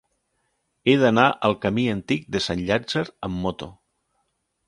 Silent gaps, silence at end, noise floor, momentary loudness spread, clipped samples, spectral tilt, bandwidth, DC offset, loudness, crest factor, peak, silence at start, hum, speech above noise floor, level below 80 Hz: none; 0.95 s; -73 dBFS; 12 LU; under 0.1%; -6 dB/octave; 11.5 kHz; under 0.1%; -22 LUFS; 22 dB; -2 dBFS; 0.85 s; none; 51 dB; -50 dBFS